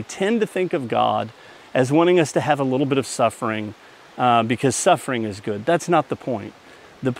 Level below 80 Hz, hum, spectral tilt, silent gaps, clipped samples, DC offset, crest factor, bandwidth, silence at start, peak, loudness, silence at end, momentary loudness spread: -66 dBFS; none; -5 dB/octave; none; under 0.1%; under 0.1%; 18 dB; 15.5 kHz; 0 s; -2 dBFS; -21 LUFS; 0 s; 10 LU